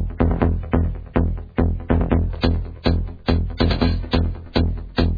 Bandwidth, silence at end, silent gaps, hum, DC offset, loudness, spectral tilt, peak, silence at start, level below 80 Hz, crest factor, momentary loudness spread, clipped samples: 5 kHz; 0 s; none; none; under 0.1%; -22 LUFS; -9 dB/octave; -2 dBFS; 0 s; -24 dBFS; 18 dB; 4 LU; under 0.1%